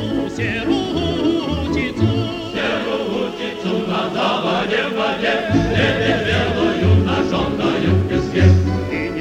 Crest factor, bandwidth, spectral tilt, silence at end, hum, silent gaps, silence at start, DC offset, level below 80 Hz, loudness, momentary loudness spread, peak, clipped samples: 16 dB; 9 kHz; -6.5 dB/octave; 0 s; none; none; 0 s; under 0.1%; -36 dBFS; -18 LUFS; 7 LU; -2 dBFS; under 0.1%